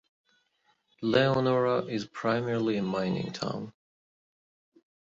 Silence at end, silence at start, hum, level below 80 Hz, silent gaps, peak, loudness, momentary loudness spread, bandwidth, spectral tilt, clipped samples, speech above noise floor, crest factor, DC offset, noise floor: 1.45 s; 1 s; none; -66 dBFS; none; -10 dBFS; -29 LUFS; 10 LU; 7.8 kHz; -6.5 dB/octave; under 0.1%; 44 dB; 20 dB; under 0.1%; -72 dBFS